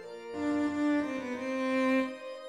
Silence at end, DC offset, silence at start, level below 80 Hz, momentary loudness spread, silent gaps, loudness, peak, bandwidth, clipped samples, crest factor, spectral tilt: 0 s; under 0.1%; 0 s; -70 dBFS; 8 LU; none; -31 LUFS; -18 dBFS; 11 kHz; under 0.1%; 14 dB; -5 dB/octave